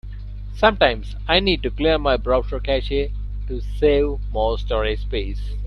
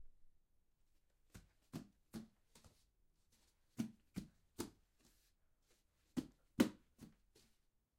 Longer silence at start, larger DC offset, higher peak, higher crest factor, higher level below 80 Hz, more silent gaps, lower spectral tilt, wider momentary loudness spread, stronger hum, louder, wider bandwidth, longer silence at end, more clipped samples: about the same, 0.05 s vs 0 s; neither; first, 0 dBFS vs -18 dBFS; second, 20 dB vs 32 dB; first, -26 dBFS vs -72 dBFS; neither; first, -7 dB/octave vs -5.5 dB/octave; second, 12 LU vs 25 LU; first, 50 Hz at -25 dBFS vs none; first, -21 LUFS vs -47 LUFS; second, 6.2 kHz vs 16 kHz; second, 0 s vs 0.9 s; neither